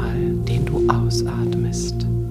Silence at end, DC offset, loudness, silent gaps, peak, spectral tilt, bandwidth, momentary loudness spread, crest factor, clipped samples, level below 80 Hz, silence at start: 0 s; under 0.1%; -21 LUFS; none; -2 dBFS; -6.5 dB/octave; 13.5 kHz; 5 LU; 18 dB; under 0.1%; -30 dBFS; 0 s